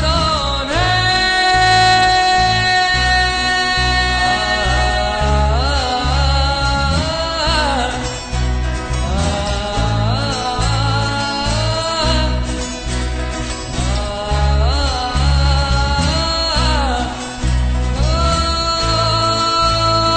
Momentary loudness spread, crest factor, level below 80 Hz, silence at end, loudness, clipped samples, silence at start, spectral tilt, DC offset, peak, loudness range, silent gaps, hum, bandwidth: 8 LU; 12 dB; -20 dBFS; 0 s; -16 LUFS; under 0.1%; 0 s; -4 dB/octave; under 0.1%; -4 dBFS; 6 LU; none; none; 9.2 kHz